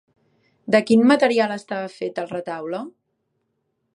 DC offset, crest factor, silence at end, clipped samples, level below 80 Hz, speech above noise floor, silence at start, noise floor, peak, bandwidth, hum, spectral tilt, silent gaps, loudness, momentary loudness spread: under 0.1%; 20 dB; 1.05 s; under 0.1%; -70 dBFS; 53 dB; 0.65 s; -73 dBFS; -4 dBFS; 11.5 kHz; none; -5.5 dB/octave; none; -20 LUFS; 16 LU